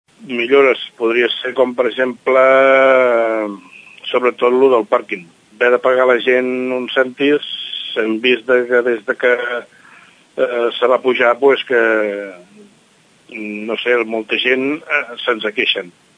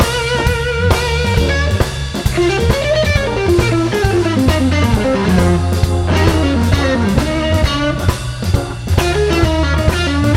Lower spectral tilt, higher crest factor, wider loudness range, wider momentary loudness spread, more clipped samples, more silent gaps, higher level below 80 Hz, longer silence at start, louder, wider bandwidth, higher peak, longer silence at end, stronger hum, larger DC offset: about the same, -4.5 dB/octave vs -5.5 dB/octave; about the same, 16 dB vs 14 dB; first, 5 LU vs 2 LU; first, 11 LU vs 4 LU; neither; neither; second, -72 dBFS vs -22 dBFS; first, 0.2 s vs 0 s; about the same, -15 LUFS vs -14 LUFS; second, 9.8 kHz vs 15.5 kHz; about the same, 0 dBFS vs 0 dBFS; first, 0.3 s vs 0 s; neither; neither